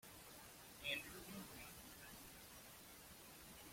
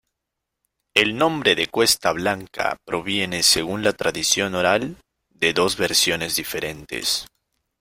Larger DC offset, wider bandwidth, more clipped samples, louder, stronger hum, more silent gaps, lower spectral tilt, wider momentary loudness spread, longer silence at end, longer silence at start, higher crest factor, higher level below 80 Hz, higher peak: neither; about the same, 16.5 kHz vs 16.5 kHz; neither; second, -53 LUFS vs -20 LUFS; neither; neither; about the same, -2 dB/octave vs -2 dB/octave; first, 12 LU vs 8 LU; second, 0 s vs 0.55 s; second, 0 s vs 0.95 s; about the same, 24 dB vs 22 dB; second, -72 dBFS vs -52 dBFS; second, -32 dBFS vs -2 dBFS